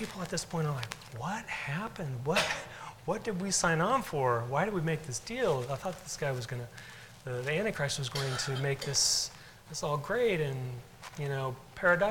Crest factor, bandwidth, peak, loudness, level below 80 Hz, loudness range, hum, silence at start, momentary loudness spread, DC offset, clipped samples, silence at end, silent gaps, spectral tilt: 20 dB; 18 kHz; -12 dBFS; -32 LUFS; -58 dBFS; 4 LU; none; 0 s; 14 LU; under 0.1%; under 0.1%; 0 s; none; -3.5 dB/octave